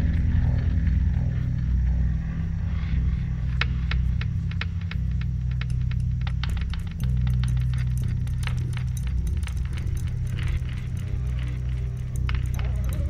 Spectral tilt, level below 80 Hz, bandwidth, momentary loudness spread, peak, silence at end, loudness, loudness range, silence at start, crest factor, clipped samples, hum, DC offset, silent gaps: -7 dB/octave; -28 dBFS; 13 kHz; 5 LU; -6 dBFS; 0 s; -27 LUFS; 3 LU; 0 s; 18 dB; under 0.1%; none; under 0.1%; none